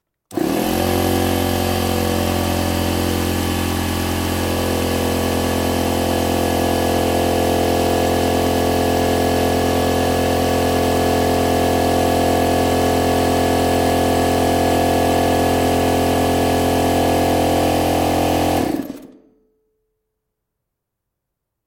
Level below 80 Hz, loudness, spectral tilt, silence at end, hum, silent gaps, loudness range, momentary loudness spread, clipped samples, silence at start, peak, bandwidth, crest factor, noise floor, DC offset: -38 dBFS; -17 LUFS; -5 dB/octave; 2.55 s; none; none; 3 LU; 3 LU; under 0.1%; 0.3 s; -4 dBFS; 17 kHz; 14 dB; -79 dBFS; under 0.1%